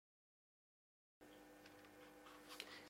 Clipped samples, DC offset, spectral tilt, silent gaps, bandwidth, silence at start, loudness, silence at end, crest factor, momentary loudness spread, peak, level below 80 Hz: under 0.1%; under 0.1%; -2 dB/octave; none; 16 kHz; 1.2 s; -61 LUFS; 0 s; 32 dB; 10 LU; -30 dBFS; -86 dBFS